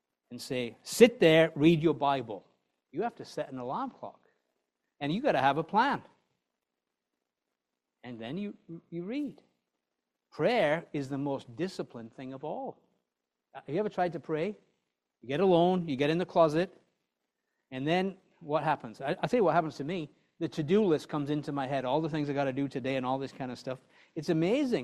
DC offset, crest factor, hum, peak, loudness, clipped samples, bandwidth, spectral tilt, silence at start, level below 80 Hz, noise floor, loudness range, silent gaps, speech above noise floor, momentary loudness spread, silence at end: under 0.1%; 26 dB; none; -6 dBFS; -30 LUFS; under 0.1%; 13.5 kHz; -6 dB/octave; 0.3 s; -70 dBFS; -87 dBFS; 9 LU; none; 57 dB; 18 LU; 0 s